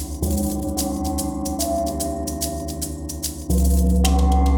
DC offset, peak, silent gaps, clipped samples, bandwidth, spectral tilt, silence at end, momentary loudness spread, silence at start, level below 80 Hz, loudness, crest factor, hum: under 0.1%; -4 dBFS; none; under 0.1%; over 20 kHz; -5.5 dB/octave; 0 s; 9 LU; 0 s; -24 dBFS; -22 LUFS; 16 dB; none